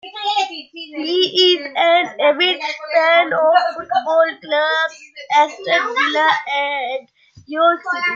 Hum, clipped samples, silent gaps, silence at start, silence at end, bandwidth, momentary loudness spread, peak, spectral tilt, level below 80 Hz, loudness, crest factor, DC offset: none; under 0.1%; none; 0.05 s; 0 s; 7.4 kHz; 10 LU; -2 dBFS; -2 dB/octave; -72 dBFS; -16 LUFS; 16 dB; under 0.1%